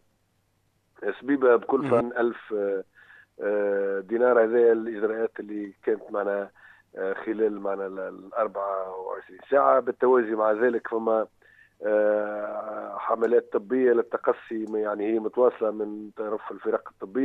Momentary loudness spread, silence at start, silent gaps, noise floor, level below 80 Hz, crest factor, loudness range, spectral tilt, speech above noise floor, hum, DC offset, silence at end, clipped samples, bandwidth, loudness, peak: 13 LU; 1 s; none; -70 dBFS; -74 dBFS; 18 dB; 5 LU; -8.5 dB/octave; 45 dB; none; under 0.1%; 0 s; under 0.1%; 4 kHz; -26 LUFS; -8 dBFS